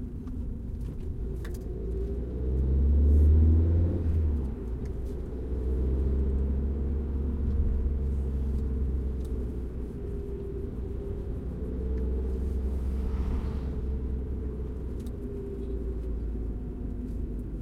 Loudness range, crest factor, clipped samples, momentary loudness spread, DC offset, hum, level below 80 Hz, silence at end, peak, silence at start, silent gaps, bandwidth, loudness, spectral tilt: 9 LU; 16 dB; under 0.1%; 12 LU; under 0.1%; none; -30 dBFS; 0 s; -12 dBFS; 0 s; none; 2.7 kHz; -31 LUFS; -10.5 dB/octave